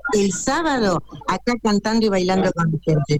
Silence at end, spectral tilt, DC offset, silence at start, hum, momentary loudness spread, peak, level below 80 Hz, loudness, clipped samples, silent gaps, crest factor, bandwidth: 0 s; -5.5 dB/octave; under 0.1%; 0.05 s; none; 4 LU; -8 dBFS; -42 dBFS; -20 LUFS; under 0.1%; none; 12 dB; 14.5 kHz